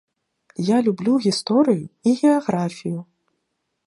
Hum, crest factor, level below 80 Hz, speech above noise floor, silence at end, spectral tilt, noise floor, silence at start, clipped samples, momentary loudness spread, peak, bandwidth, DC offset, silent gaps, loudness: none; 16 dB; -68 dBFS; 56 dB; 0.85 s; -6 dB/octave; -75 dBFS; 0.6 s; under 0.1%; 12 LU; -4 dBFS; 11.5 kHz; under 0.1%; none; -20 LUFS